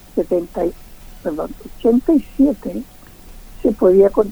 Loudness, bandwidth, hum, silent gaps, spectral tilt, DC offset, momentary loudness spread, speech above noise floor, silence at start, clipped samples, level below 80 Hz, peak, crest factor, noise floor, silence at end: -17 LUFS; over 20 kHz; none; none; -8 dB/octave; under 0.1%; 16 LU; 22 dB; 0.15 s; under 0.1%; -38 dBFS; -2 dBFS; 16 dB; -38 dBFS; 0 s